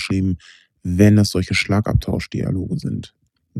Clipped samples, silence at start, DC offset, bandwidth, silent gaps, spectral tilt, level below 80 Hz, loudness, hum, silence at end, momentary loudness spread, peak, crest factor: under 0.1%; 0 s; under 0.1%; 14 kHz; none; -6.5 dB/octave; -36 dBFS; -19 LUFS; none; 0 s; 15 LU; 0 dBFS; 20 dB